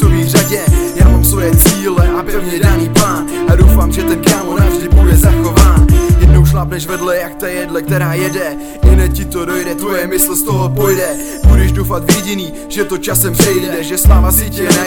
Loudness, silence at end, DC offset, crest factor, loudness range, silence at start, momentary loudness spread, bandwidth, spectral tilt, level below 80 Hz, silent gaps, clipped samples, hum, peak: -11 LUFS; 0 s; under 0.1%; 10 dB; 4 LU; 0 s; 9 LU; 19.5 kHz; -5 dB/octave; -14 dBFS; none; 1%; none; 0 dBFS